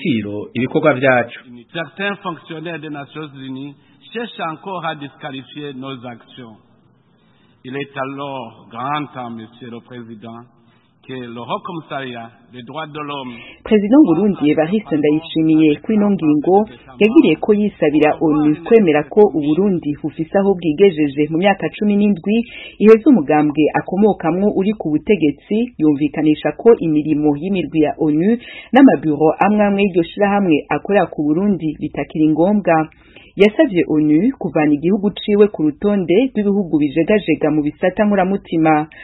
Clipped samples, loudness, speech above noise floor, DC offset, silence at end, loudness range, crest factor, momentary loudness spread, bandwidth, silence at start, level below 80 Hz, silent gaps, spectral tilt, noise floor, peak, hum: under 0.1%; -15 LUFS; 39 dB; under 0.1%; 0 s; 14 LU; 16 dB; 17 LU; 4.1 kHz; 0 s; -50 dBFS; none; -9.5 dB/octave; -54 dBFS; 0 dBFS; none